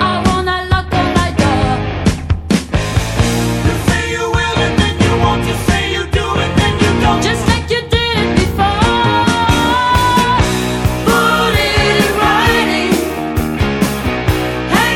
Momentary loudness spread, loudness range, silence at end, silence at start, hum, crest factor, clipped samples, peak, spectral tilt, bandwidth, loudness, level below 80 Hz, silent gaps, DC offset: 5 LU; 3 LU; 0 s; 0 s; none; 12 dB; under 0.1%; 0 dBFS; -5 dB/octave; 17 kHz; -13 LUFS; -24 dBFS; none; under 0.1%